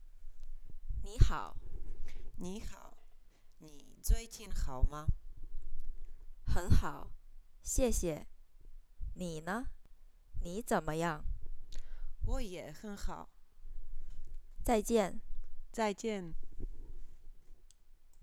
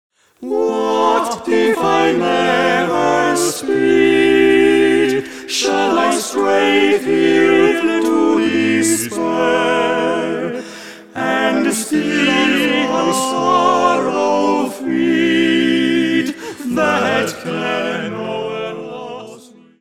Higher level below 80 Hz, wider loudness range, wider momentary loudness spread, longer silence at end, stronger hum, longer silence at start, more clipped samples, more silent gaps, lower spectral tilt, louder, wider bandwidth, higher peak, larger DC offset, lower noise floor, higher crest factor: first, -40 dBFS vs -58 dBFS; about the same, 6 LU vs 4 LU; first, 23 LU vs 11 LU; second, 0 s vs 0.4 s; neither; second, 0 s vs 0.4 s; neither; neither; first, -5.5 dB/octave vs -3.5 dB/octave; second, -38 LUFS vs -15 LUFS; second, 14.5 kHz vs 16 kHz; second, -10 dBFS vs 0 dBFS; second, under 0.1% vs 0.3%; first, -56 dBFS vs -40 dBFS; first, 24 dB vs 14 dB